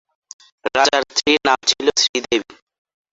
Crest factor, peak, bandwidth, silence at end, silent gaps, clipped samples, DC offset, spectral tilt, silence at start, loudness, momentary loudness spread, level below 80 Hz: 20 dB; 0 dBFS; 8.2 kHz; 0.75 s; 2.09-2.14 s; under 0.1%; under 0.1%; -1 dB/octave; 0.65 s; -17 LUFS; 7 LU; -58 dBFS